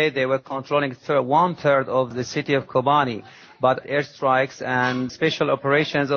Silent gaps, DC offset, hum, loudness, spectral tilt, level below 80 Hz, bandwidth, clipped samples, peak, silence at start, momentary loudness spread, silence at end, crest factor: none; under 0.1%; none; -21 LUFS; -5.5 dB/octave; -64 dBFS; 7 kHz; under 0.1%; -4 dBFS; 0 s; 6 LU; 0 s; 16 dB